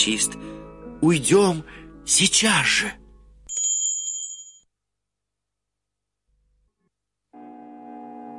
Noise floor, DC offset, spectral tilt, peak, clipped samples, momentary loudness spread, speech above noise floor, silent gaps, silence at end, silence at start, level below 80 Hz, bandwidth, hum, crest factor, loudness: -84 dBFS; under 0.1%; -2.5 dB/octave; -4 dBFS; under 0.1%; 23 LU; 64 dB; none; 0 s; 0 s; -54 dBFS; 11.5 kHz; 50 Hz at -55 dBFS; 20 dB; -20 LUFS